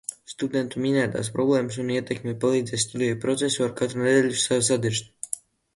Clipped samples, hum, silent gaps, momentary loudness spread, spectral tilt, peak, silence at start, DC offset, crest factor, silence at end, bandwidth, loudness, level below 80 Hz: under 0.1%; none; none; 10 LU; -4 dB/octave; -8 dBFS; 0.1 s; under 0.1%; 18 dB; 0.35 s; 11.5 kHz; -24 LUFS; -62 dBFS